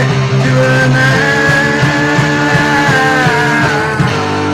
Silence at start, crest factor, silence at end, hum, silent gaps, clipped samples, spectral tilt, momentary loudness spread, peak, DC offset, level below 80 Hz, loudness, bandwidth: 0 s; 8 dB; 0 s; none; none; under 0.1%; -5.5 dB/octave; 3 LU; -2 dBFS; under 0.1%; -36 dBFS; -10 LUFS; 14.5 kHz